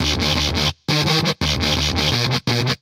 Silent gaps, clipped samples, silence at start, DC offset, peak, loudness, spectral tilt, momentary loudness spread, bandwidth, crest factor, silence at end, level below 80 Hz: none; under 0.1%; 0 s; under 0.1%; -4 dBFS; -18 LUFS; -4 dB/octave; 2 LU; 16.5 kHz; 16 dB; 0.05 s; -32 dBFS